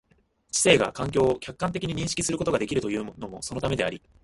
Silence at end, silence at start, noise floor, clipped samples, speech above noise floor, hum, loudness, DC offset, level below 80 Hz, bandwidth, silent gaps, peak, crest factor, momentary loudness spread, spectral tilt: 0.25 s; 0.55 s; -65 dBFS; under 0.1%; 39 dB; none; -26 LUFS; under 0.1%; -50 dBFS; 11.5 kHz; none; -4 dBFS; 24 dB; 12 LU; -4 dB/octave